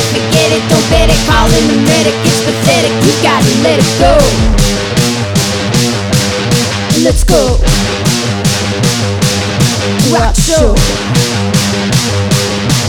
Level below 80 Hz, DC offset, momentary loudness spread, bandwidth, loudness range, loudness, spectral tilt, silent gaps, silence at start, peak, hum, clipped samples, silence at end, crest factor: -18 dBFS; under 0.1%; 3 LU; 19 kHz; 2 LU; -10 LUFS; -4.5 dB/octave; none; 0 s; 0 dBFS; none; under 0.1%; 0 s; 10 dB